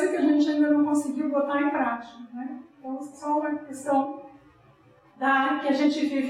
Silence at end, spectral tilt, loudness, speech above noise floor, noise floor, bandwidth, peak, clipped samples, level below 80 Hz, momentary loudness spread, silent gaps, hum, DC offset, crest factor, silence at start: 0 s; -4 dB/octave; -25 LUFS; 31 dB; -57 dBFS; 11.5 kHz; -10 dBFS; under 0.1%; -74 dBFS; 15 LU; none; none; under 0.1%; 14 dB; 0 s